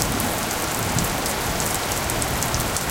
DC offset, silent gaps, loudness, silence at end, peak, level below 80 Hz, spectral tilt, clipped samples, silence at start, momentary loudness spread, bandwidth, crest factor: under 0.1%; none; -22 LUFS; 0 s; 0 dBFS; -36 dBFS; -3 dB/octave; under 0.1%; 0 s; 1 LU; 17.5 kHz; 22 dB